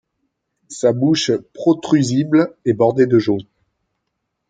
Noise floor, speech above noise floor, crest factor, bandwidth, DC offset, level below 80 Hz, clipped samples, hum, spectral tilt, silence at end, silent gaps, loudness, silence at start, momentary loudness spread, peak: -75 dBFS; 59 dB; 16 dB; 9.2 kHz; under 0.1%; -60 dBFS; under 0.1%; none; -6 dB/octave; 1.05 s; none; -17 LUFS; 0.7 s; 6 LU; -2 dBFS